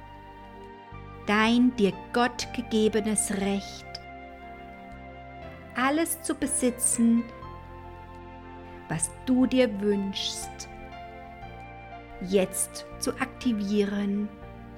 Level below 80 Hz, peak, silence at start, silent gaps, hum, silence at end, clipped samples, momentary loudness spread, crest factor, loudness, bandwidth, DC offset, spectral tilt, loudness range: -50 dBFS; -10 dBFS; 0 s; none; none; 0 s; under 0.1%; 21 LU; 18 dB; -26 LUFS; 17.5 kHz; under 0.1%; -4 dB/octave; 5 LU